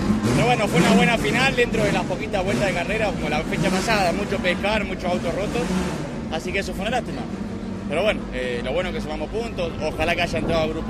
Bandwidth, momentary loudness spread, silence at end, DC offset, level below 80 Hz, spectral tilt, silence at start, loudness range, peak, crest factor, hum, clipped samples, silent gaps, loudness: 14.5 kHz; 9 LU; 0 s; under 0.1%; -38 dBFS; -5 dB/octave; 0 s; 6 LU; -4 dBFS; 18 dB; none; under 0.1%; none; -22 LUFS